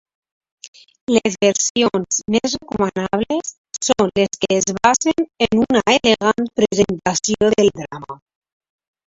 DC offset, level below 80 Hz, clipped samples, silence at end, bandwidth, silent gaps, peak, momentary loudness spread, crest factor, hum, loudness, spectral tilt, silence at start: under 0.1%; -50 dBFS; under 0.1%; 0.95 s; 8 kHz; 1.70-1.75 s, 3.58-3.64 s; 0 dBFS; 9 LU; 18 dB; none; -17 LUFS; -3.5 dB/octave; 1.1 s